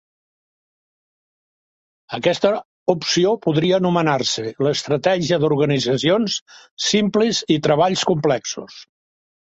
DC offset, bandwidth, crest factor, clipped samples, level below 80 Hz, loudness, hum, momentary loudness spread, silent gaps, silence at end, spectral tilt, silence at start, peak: under 0.1%; 8.2 kHz; 18 dB; under 0.1%; -60 dBFS; -19 LUFS; none; 6 LU; 2.65-2.86 s, 6.41-6.46 s, 6.71-6.77 s; 0.75 s; -4.5 dB/octave; 2.1 s; -2 dBFS